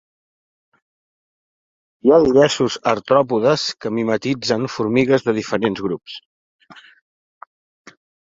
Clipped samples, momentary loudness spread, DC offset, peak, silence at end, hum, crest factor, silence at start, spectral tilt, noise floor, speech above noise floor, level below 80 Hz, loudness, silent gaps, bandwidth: under 0.1%; 10 LU; under 0.1%; -2 dBFS; 1.6 s; none; 18 dB; 2.05 s; -5 dB/octave; under -90 dBFS; over 73 dB; -56 dBFS; -18 LUFS; 6.25-6.59 s; 7.8 kHz